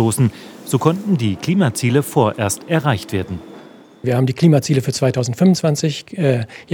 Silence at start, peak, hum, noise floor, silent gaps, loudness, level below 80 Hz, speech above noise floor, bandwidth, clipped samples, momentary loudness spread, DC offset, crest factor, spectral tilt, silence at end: 0 s; 0 dBFS; none; -41 dBFS; none; -17 LUFS; -58 dBFS; 24 dB; 19.5 kHz; under 0.1%; 8 LU; under 0.1%; 18 dB; -6 dB/octave; 0 s